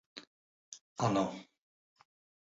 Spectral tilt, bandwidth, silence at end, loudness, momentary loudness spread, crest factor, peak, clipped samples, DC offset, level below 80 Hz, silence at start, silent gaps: -5.5 dB/octave; 7.6 kHz; 1 s; -34 LUFS; 21 LU; 22 dB; -16 dBFS; under 0.1%; under 0.1%; -72 dBFS; 0.15 s; 0.27-0.72 s, 0.81-0.96 s